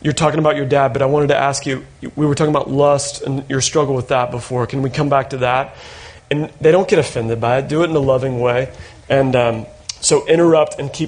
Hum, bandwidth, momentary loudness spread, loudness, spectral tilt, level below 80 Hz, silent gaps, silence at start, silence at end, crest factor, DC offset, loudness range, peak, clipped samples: none; 10 kHz; 10 LU; -16 LUFS; -5 dB/octave; -46 dBFS; none; 0.05 s; 0 s; 14 dB; under 0.1%; 2 LU; -2 dBFS; under 0.1%